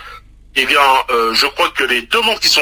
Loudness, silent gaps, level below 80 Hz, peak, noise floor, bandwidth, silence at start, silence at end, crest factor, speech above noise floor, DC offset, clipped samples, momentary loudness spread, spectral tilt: -13 LUFS; none; -44 dBFS; 0 dBFS; -37 dBFS; 16 kHz; 0 s; 0 s; 14 dB; 23 dB; under 0.1%; under 0.1%; 5 LU; -0.5 dB/octave